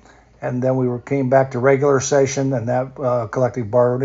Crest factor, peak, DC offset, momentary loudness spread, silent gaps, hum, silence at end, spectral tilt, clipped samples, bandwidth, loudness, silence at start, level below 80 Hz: 18 dB; 0 dBFS; under 0.1%; 6 LU; none; none; 0 s; -7 dB/octave; under 0.1%; 7.8 kHz; -18 LUFS; 0.4 s; -54 dBFS